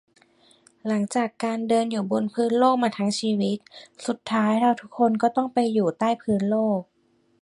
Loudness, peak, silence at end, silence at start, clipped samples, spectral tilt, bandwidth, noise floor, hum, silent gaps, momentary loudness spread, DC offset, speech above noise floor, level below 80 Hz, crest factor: -24 LUFS; -6 dBFS; 0.6 s; 0.85 s; under 0.1%; -6 dB/octave; 11.5 kHz; -58 dBFS; none; none; 7 LU; under 0.1%; 35 dB; -68 dBFS; 18 dB